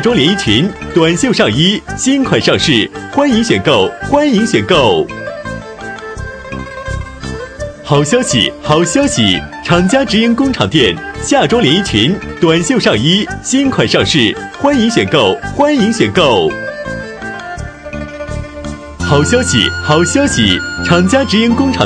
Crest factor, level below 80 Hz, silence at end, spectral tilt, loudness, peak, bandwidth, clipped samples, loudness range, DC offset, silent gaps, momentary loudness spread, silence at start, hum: 12 dB; -34 dBFS; 0 s; -4.5 dB/octave; -11 LUFS; 0 dBFS; 10.5 kHz; under 0.1%; 5 LU; under 0.1%; none; 14 LU; 0 s; none